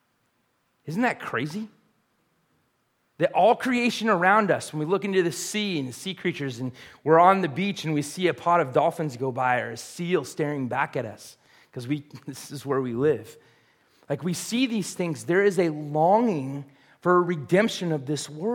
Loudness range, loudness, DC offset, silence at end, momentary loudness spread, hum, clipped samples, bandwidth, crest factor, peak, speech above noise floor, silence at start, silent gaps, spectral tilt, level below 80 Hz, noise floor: 7 LU; -25 LUFS; under 0.1%; 0 s; 14 LU; none; under 0.1%; 17 kHz; 22 dB; -4 dBFS; 46 dB; 0.85 s; none; -5 dB/octave; -72 dBFS; -71 dBFS